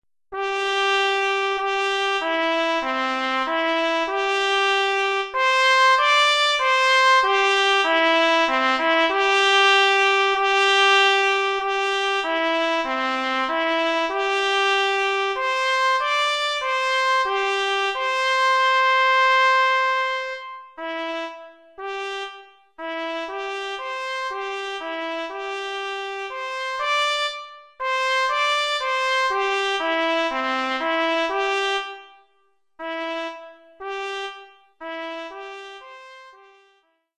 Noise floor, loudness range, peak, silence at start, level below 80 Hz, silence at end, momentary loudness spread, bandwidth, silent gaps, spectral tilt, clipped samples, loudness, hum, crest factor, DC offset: -67 dBFS; 13 LU; -4 dBFS; 0.3 s; -64 dBFS; 0.85 s; 15 LU; 13 kHz; none; 0.5 dB/octave; under 0.1%; -20 LUFS; none; 18 dB; under 0.1%